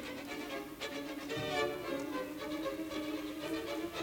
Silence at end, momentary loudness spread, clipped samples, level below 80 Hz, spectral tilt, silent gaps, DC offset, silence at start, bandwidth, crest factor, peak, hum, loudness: 0 s; 6 LU; under 0.1%; -64 dBFS; -4 dB/octave; none; under 0.1%; 0 s; over 20 kHz; 18 dB; -22 dBFS; none; -39 LUFS